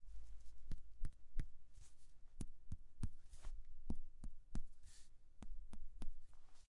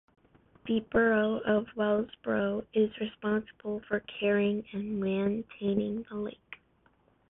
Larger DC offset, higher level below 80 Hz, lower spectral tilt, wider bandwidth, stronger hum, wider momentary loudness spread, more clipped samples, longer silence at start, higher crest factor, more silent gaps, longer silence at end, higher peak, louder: neither; first, -50 dBFS vs -60 dBFS; second, -6 dB/octave vs -10 dB/octave; first, 10.5 kHz vs 3.9 kHz; neither; about the same, 14 LU vs 12 LU; neither; second, 0 s vs 0.65 s; about the same, 16 dB vs 18 dB; neither; second, 0.15 s vs 0.75 s; second, -28 dBFS vs -14 dBFS; second, -58 LUFS vs -31 LUFS